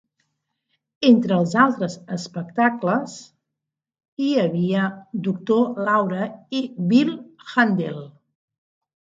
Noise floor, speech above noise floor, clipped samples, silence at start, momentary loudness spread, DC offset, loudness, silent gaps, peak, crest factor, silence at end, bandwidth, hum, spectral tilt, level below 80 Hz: -84 dBFS; 64 dB; under 0.1%; 1 s; 13 LU; under 0.1%; -21 LUFS; 4.08-4.17 s; -2 dBFS; 20 dB; 0.95 s; 7.8 kHz; none; -6.5 dB/octave; -70 dBFS